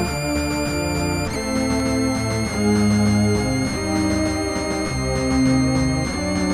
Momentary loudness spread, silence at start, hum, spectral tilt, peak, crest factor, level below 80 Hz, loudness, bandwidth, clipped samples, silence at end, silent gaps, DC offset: 5 LU; 0 s; none; -5 dB/octave; -6 dBFS; 14 dB; -34 dBFS; -20 LUFS; 15.5 kHz; under 0.1%; 0 s; none; under 0.1%